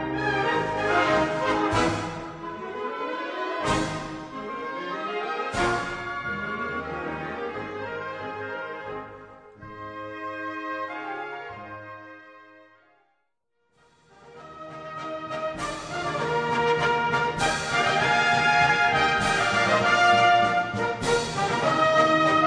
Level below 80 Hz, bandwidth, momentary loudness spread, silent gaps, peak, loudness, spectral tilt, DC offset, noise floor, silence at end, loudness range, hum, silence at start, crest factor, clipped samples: -50 dBFS; 10.5 kHz; 18 LU; none; -6 dBFS; -25 LUFS; -4 dB/octave; under 0.1%; -76 dBFS; 0 s; 17 LU; none; 0 s; 20 dB; under 0.1%